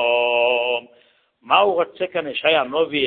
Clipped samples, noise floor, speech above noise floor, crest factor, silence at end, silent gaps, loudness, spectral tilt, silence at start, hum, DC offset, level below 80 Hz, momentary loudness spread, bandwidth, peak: under 0.1%; -57 dBFS; 38 dB; 18 dB; 0 s; none; -19 LUFS; -8 dB/octave; 0 s; none; under 0.1%; -66 dBFS; 7 LU; 4.4 kHz; -2 dBFS